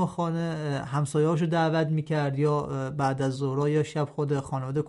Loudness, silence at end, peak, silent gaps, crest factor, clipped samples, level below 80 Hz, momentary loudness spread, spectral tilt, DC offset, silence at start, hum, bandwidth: -27 LUFS; 0 s; -14 dBFS; none; 14 dB; under 0.1%; -60 dBFS; 5 LU; -7 dB/octave; under 0.1%; 0 s; none; 11.5 kHz